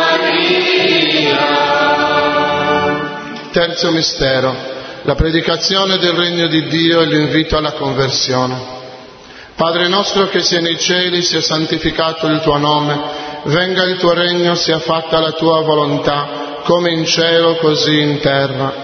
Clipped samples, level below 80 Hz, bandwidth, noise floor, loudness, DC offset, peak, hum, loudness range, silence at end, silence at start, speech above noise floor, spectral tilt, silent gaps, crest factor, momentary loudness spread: under 0.1%; -36 dBFS; 6.6 kHz; -36 dBFS; -13 LUFS; under 0.1%; 0 dBFS; none; 2 LU; 0 s; 0 s; 22 dB; -4 dB/octave; none; 14 dB; 8 LU